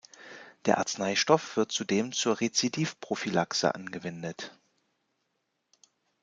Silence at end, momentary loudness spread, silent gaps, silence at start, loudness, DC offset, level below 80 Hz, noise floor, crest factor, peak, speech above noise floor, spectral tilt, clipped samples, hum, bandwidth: 1.7 s; 15 LU; none; 0.2 s; -29 LUFS; under 0.1%; -74 dBFS; -79 dBFS; 24 dB; -8 dBFS; 50 dB; -3.5 dB/octave; under 0.1%; none; 10 kHz